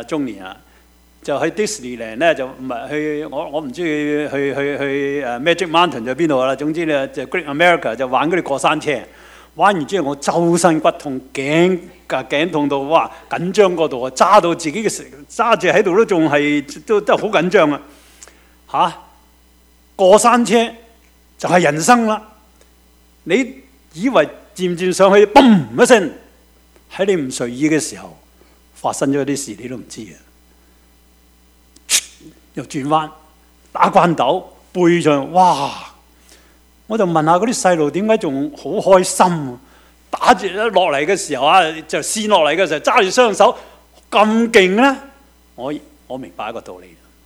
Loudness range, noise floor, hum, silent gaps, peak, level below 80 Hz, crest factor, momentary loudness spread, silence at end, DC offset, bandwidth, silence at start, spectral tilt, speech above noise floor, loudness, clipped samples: 8 LU; -51 dBFS; none; none; 0 dBFS; -52 dBFS; 16 dB; 15 LU; 0.45 s; under 0.1%; 16.5 kHz; 0 s; -4 dB/octave; 35 dB; -15 LUFS; under 0.1%